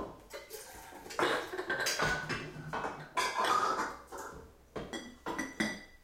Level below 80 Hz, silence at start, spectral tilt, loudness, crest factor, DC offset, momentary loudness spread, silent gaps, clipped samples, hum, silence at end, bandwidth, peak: -60 dBFS; 0 s; -3 dB/octave; -35 LUFS; 20 dB; under 0.1%; 17 LU; none; under 0.1%; none; 0.1 s; 16.5 kHz; -16 dBFS